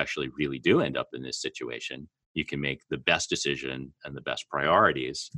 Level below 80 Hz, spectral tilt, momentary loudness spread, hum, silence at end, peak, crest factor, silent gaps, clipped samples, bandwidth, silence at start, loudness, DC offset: -58 dBFS; -4 dB/octave; 14 LU; none; 0 s; -6 dBFS; 22 dB; 2.26-2.35 s; under 0.1%; 11.5 kHz; 0 s; -28 LUFS; under 0.1%